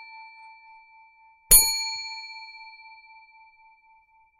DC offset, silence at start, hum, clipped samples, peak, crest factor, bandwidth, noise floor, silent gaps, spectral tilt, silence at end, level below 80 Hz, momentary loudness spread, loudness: under 0.1%; 0 s; none; under 0.1%; -2 dBFS; 26 dB; 13.5 kHz; -60 dBFS; none; 1.5 dB/octave; 1.7 s; -42 dBFS; 29 LU; -18 LUFS